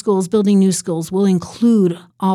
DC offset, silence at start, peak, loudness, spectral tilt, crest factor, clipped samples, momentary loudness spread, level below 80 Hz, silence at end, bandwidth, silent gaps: under 0.1%; 0.05 s; -4 dBFS; -16 LUFS; -7 dB/octave; 10 dB; under 0.1%; 7 LU; -58 dBFS; 0 s; 13.5 kHz; none